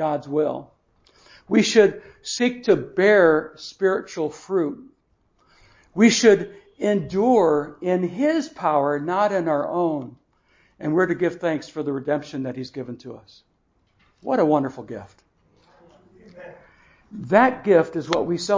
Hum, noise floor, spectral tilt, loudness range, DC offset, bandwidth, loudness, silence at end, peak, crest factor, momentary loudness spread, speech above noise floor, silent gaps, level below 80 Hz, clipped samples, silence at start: none; -66 dBFS; -5 dB/octave; 8 LU; under 0.1%; 7.6 kHz; -21 LUFS; 0 s; -2 dBFS; 20 dB; 18 LU; 45 dB; none; -62 dBFS; under 0.1%; 0 s